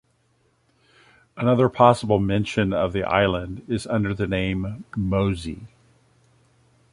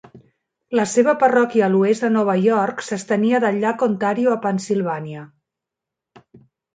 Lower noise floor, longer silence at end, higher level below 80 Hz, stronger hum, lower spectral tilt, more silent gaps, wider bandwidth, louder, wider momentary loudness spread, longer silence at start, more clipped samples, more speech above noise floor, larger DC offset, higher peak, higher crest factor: second, -65 dBFS vs -85 dBFS; first, 1.25 s vs 0.4 s; first, -44 dBFS vs -68 dBFS; neither; about the same, -7 dB/octave vs -6 dB/octave; neither; first, 11.5 kHz vs 9.4 kHz; second, -22 LUFS vs -19 LUFS; first, 12 LU vs 9 LU; first, 1.35 s vs 0.15 s; neither; second, 43 dB vs 67 dB; neither; about the same, -2 dBFS vs -4 dBFS; first, 22 dB vs 16 dB